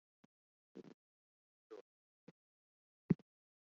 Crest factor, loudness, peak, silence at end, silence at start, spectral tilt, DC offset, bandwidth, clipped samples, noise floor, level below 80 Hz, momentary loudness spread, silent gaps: 30 dB; -41 LUFS; -20 dBFS; 0.45 s; 0.75 s; -10.5 dB/octave; under 0.1%; 6 kHz; under 0.1%; under -90 dBFS; -80 dBFS; 21 LU; 0.94-1.70 s, 1.81-3.09 s